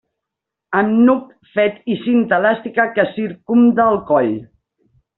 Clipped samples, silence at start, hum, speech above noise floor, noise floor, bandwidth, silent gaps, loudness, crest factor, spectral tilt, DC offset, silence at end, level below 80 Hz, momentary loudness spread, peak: under 0.1%; 0.7 s; none; 67 dB; -82 dBFS; 4.1 kHz; none; -16 LUFS; 14 dB; -5 dB/octave; under 0.1%; 0.75 s; -58 dBFS; 9 LU; -2 dBFS